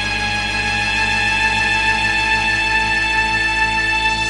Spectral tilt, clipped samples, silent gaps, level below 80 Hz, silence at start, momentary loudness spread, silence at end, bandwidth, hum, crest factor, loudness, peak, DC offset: -2.5 dB/octave; under 0.1%; none; -32 dBFS; 0 s; 3 LU; 0 s; 11.5 kHz; none; 14 dB; -15 LUFS; -4 dBFS; 0.1%